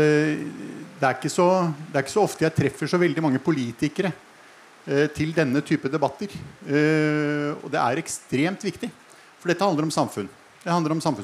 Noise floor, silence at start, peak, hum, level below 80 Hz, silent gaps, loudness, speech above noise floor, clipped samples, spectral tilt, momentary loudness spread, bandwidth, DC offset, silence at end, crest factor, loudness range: -49 dBFS; 0 s; -6 dBFS; none; -62 dBFS; none; -24 LUFS; 26 dB; under 0.1%; -6 dB/octave; 14 LU; 15 kHz; under 0.1%; 0 s; 18 dB; 3 LU